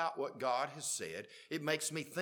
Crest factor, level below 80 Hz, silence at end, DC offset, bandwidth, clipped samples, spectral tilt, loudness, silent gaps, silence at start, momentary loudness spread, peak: 20 dB; -86 dBFS; 0 s; under 0.1%; 19 kHz; under 0.1%; -2.5 dB/octave; -38 LUFS; none; 0 s; 8 LU; -18 dBFS